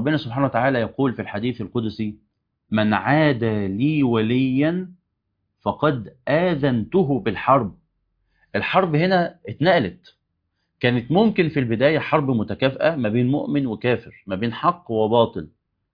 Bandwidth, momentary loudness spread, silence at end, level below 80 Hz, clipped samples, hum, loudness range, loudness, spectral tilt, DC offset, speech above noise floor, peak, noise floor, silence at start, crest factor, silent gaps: 5.2 kHz; 9 LU; 0.45 s; -56 dBFS; under 0.1%; none; 2 LU; -21 LUFS; -9.5 dB/octave; under 0.1%; 54 dB; -4 dBFS; -75 dBFS; 0 s; 18 dB; none